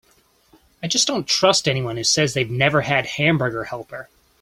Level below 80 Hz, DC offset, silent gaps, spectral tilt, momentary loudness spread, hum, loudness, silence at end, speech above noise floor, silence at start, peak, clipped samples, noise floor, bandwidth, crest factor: -54 dBFS; under 0.1%; none; -3 dB/octave; 15 LU; none; -19 LUFS; 0.35 s; 38 dB; 0.8 s; -2 dBFS; under 0.1%; -59 dBFS; 16 kHz; 20 dB